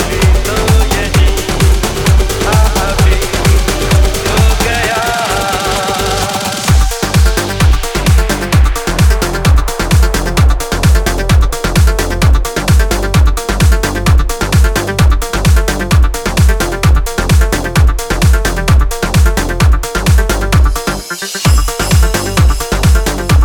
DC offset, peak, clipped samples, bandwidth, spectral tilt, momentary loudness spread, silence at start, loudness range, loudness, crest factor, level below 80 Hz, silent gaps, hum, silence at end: under 0.1%; 0 dBFS; under 0.1%; 19 kHz; -4.5 dB/octave; 2 LU; 0 s; 1 LU; -12 LUFS; 10 dB; -12 dBFS; none; none; 0 s